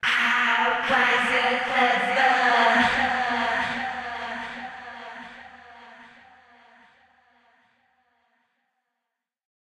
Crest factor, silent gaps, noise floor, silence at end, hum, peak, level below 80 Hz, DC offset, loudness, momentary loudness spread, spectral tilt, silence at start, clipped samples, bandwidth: 20 dB; none; -84 dBFS; 3.6 s; none; -6 dBFS; -60 dBFS; under 0.1%; -21 LUFS; 20 LU; -2.5 dB/octave; 0.05 s; under 0.1%; 12.5 kHz